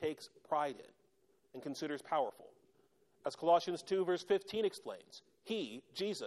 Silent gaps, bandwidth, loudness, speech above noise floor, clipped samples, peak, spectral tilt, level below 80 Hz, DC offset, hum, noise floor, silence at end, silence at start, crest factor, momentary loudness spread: none; 13 kHz; -38 LUFS; 37 dB; under 0.1%; -18 dBFS; -4.5 dB/octave; -82 dBFS; under 0.1%; none; -75 dBFS; 0 s; 0 s; 20 dB; 18 LU